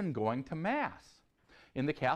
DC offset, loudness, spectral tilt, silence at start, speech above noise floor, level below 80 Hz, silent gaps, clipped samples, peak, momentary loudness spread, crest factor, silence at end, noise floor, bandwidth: under 0.1%; -36 LUFS; -7.5 dB/octave; 0 s; 29 dB; -68 dBFS; none; under 0.1%; -18 dBFS; 10 LU; 18 dB; 0 s; -64 dBFS; 10.5 kHz